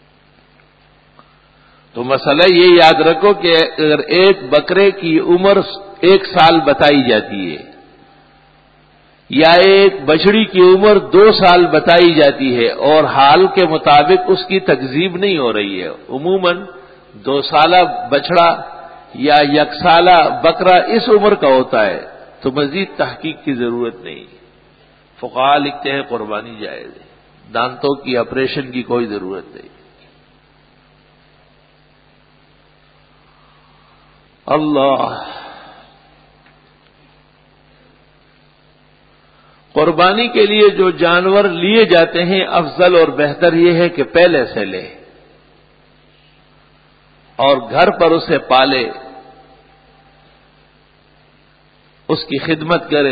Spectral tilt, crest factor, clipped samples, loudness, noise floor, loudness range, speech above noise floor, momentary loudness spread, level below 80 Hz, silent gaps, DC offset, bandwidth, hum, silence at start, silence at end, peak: -7 dB/octave; 14 dB; under 0.1%; -12 LUFS; -50 dBFS; 12 LU; 39 dB; 15 LU; -50 dBFS; none; under 0.1%; 8 kHz; none; 1.95 s; 0 s; 0 dBFS